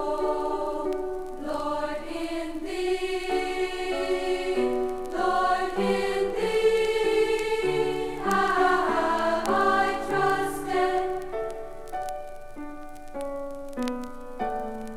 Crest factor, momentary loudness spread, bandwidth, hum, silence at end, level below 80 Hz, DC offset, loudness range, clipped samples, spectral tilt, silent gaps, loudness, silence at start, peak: 16 dB; 13 LU; 15.5 kHz; none; 0 s; -44 dBFS; under 0.1%; 8 LU; under 0.1%; -4.5 dB/octave; none; -27 LUFS; 0 s; -10 dBFS